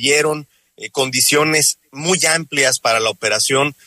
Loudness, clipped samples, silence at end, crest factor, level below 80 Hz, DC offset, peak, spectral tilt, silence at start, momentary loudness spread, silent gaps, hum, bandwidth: -15 LUFS; under 0.1%; 0.15 s; 16 dB; -60 dBFS; under 0.1%; -2 dBFS; -2 dB/octave; 0 s; 9 LU; none; none; 16 kHz